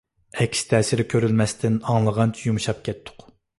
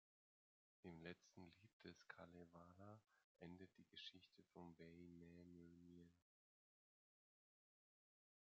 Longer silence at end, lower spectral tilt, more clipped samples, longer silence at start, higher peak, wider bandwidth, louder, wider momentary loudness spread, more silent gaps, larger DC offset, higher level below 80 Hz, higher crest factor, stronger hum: second, 0.5 s vs 2.4 s; first, -5.5 dB/octave vs -4 dB/octave; neither; second, 0.35 s vs 0.85 s; first, -6 dBFS vs -40 dBFS; first, 11.5 kHz vs 7.2 kHz; first, -22 LUFS vs -64 LUFS; first, 10 LU vs 7 LU; second, none vs 1.73-1.80 s, 3.24-3.35 s; neither; first, -50 dBFS vs under -90 dBFS; second, 16 dB vs 26 dB; neither